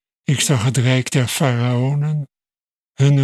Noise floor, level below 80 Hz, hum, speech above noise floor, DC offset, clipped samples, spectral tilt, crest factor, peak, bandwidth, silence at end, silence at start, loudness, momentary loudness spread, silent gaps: under -90 dBFS; -60 dBFS; none; over 74 dB; under 0.1%; under 0.1%; -5 dB/octave; 16 dB; -2 dBFS; 14 kHz; 0 s; 0.3 s; -18 LUFS; 6 LU; 2.64-2.68 s